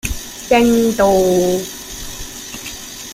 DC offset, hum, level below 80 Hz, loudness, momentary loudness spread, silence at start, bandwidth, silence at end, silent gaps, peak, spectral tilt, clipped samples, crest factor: under 0.1%; none; -36 dBFS; -14 LUFS; 15 LU; 0.05 s; 16 kHz; 0 s; none; -2 dBFS; -4 dB/octave; under 0.1%; 16 dB